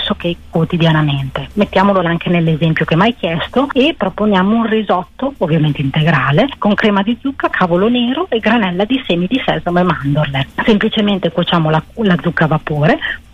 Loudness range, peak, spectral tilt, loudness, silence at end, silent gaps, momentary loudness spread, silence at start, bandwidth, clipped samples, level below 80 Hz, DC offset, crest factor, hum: 1 LU; -2 dBFS; -8 dB/octave; -14 LUFS; 0.15 s; none; 5 LU; 0 s; 7.2 kHz; under 0.1%; -38 dBFS; under 0.1%; 12 dB; none